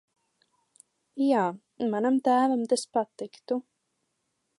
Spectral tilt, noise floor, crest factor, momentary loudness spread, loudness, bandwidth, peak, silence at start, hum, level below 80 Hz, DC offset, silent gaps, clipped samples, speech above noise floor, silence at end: -5 dB/octave; -78 dBFS; 16 dB; 11 LU; -27 LUFS; 11.5 kHz; -12 dBFS; 1.15 s; none; -82 dBFS; under 0.1%; none; under 0.1%; 52 dB; 1 s